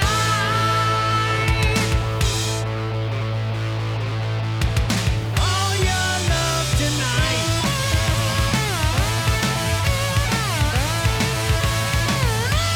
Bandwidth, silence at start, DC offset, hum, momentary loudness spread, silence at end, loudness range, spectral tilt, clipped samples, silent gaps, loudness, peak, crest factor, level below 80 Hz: 19 kHz; 0 s; under 0.1%; none; 5 LU; 0 s; 3 LU; -4 dB/octave; under 0.1%; none; -20 LUFS; -10 dBFS; 10 dB; -28 dBFS